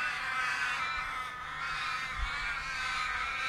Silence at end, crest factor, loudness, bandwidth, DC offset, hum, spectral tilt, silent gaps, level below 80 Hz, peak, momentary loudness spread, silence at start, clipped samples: 0 s; 16 dB; -33 LUFS; 16 kHz; under 0.1%; none; -1 dB/octave; none; -48 dBFS; -20 dBFS; 5 LU; 0 s; under 0.1%